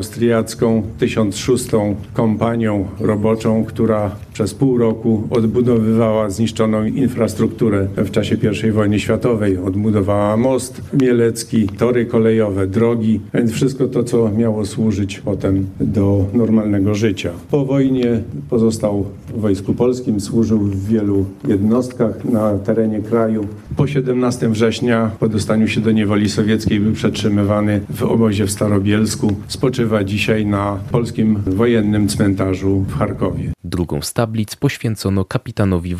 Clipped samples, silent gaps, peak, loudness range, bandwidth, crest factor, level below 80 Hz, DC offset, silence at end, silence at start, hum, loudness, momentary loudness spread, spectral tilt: under 0.1%; none; 0 dBFS; 2 LU; 14.5 kHz; 16 dB; -44 dBFS; under 0.1%; 0 s; 0 s; none; -17 LUFS; 5 LU; -6.5 dB/octave